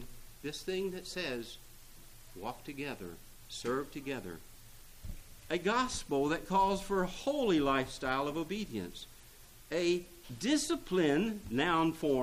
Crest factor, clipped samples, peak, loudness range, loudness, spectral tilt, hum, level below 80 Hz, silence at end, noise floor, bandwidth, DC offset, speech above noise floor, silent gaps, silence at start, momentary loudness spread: 18 dB; under 0.1%; -18 dBFS; 10 LU; -34 LUFS; -4.5 dB/octave; none; -54 dBFS; 0 s; -55 dBFS; 15.5 kHz; under 0.1%; 22 dB; none; 0 s; 19 LU